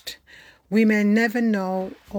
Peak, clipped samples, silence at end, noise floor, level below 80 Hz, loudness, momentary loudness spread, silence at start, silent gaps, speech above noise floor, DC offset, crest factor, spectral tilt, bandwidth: -8 dBFS; under 0.1%; 0 s; -50 dBFS; -60 dBFS; -21 LUFS; 15 LU; 0.05 s; none; 30 dB; under 0.1%; 14 dB; -6.5 dB/octave; 19 kHz